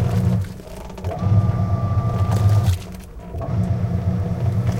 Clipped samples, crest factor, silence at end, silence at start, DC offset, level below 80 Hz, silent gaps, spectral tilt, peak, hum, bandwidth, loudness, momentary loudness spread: under 0.1%; 14 dB; 0 s; 0 s; under 0.1%; -34 dBFS; none; -8 dB/octave; -6 dBFS; none; 14.5 kHz; -21 LUFS; 15 LU